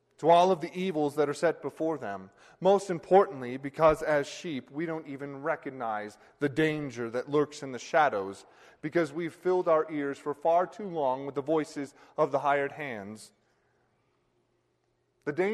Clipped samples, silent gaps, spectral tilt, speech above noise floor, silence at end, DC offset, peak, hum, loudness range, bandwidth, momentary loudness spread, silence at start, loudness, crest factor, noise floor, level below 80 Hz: under 0.1%; none; -6 dB/octave; 45 dB; 0 s; under 0.1%; -10 dBFS; none; 5 LU; 13 kHz; 15 LU; 0.2 s; -29 LUFS; 20 dB; -74 dBFS; -64 dBFS